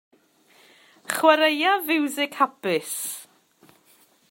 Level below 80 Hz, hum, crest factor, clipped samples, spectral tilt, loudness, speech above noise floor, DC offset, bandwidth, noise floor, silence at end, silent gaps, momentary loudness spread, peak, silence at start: -84 dBFS; none; 22 dB; under 0.1%; -2 dB/octave; -22 LUFS; 37 dB; under 0.1%; 16.5 kHz; -59 dBFS; 1.1 s; none; 12 LU; -2 dBFS; 1.1 s